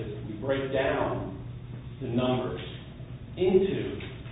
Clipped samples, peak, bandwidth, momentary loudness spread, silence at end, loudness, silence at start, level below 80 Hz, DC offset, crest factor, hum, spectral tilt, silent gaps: under 0.1%; -10 dBFS; 4 kHz; 16 LU; 0 s; -29 LUFS; 0 s; -48 dBFS; under 0.1%; 20 dB; none; -11 dB/octave; none